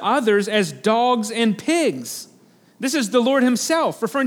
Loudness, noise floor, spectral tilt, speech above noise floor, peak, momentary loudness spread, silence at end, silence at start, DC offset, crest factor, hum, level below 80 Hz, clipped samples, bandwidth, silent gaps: -19 LUFS; -49 dBFS; -4 dB/octave; 30 dB; -4 dBFS; 8 LU; 0 s; 0 s; under 0.1%; 16 dB; none; -78 dBFS; under 0.1%; 19 kHz; none